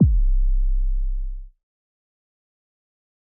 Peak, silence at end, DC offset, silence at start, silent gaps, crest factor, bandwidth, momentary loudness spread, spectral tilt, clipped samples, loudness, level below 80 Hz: -6 dBFS; 1.85 s; under 0.1%; 0 s; none; 16 dB; 0.4 kHz; 14 LU; -24 dB/octave; under 0.1%; -25 LUFS; -22 dBFS